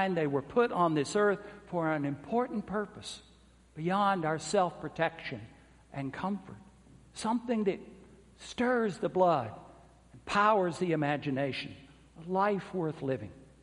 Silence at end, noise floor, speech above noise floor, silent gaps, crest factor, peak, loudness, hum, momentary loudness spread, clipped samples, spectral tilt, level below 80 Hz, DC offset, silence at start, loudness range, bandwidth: 0.2 s; -57 dBFS; 26 dB; none; 20 dB; -12 dBFS; -31 LUFS; none; 16 LU; under 0.1%; -6 dB/octave; -64 dBFS; under 0.1%; 0 s; 5 LU; 11.5 kHz